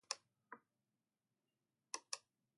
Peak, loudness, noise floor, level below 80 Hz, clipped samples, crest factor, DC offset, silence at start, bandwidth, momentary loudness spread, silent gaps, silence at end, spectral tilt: -22 dBFS; -50 LUFS; under -90 dBFS; under -90 dBFS; under 0.1%; 34 dB; under 0.1%; 0.1 s; 11.5 kHz; 14 LU; none; 0.4 s; 2 dB/octave